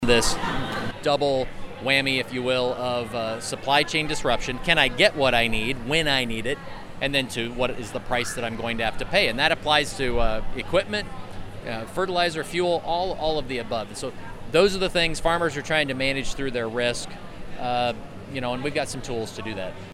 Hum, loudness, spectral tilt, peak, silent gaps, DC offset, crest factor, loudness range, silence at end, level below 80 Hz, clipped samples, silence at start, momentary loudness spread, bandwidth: none; -24 LUFS; -3.5 dB/octave; -4 dBFS; none; under 0.1%; 22 dB; 5 LU; 0 s; -38 dBFS; under 0.1%; 0 s; 13 LU; 14.5 kHz